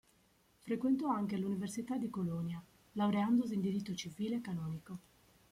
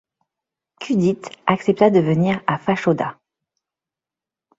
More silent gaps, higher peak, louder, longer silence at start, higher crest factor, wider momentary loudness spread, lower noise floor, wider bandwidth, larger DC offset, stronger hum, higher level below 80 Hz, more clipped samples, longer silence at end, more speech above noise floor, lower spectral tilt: neither; second, -22 dBFS vs -2 dBFS; second, -37 LUFS vs -19 LUFS; second, 0.65 s vs 0.8 s; about the same, 16 dB vs 20 dB; first, 14 LU vs 8 LU; second, -71 dBFS vs -89 dBFS; first, 15.5 kHz vs 7.8 kHz; neither; neither; second, -72 dBFS vs -60 dBFS; neither; second, 0.5 s vs 1.45 s; second, 35 dB vs 71 dB; about the same, -6.5 dB/octave vs -7.5 dB/octave